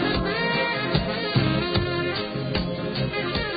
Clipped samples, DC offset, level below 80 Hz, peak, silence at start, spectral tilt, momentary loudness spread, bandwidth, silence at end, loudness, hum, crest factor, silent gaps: under 0.1%; under 0.1%; -40 dBFS; -6 dBFS; 0 s; -10.5 dB/octave; 4 LU; 5 kHz; 0 s; -24 LUFS; none; 18 dB; none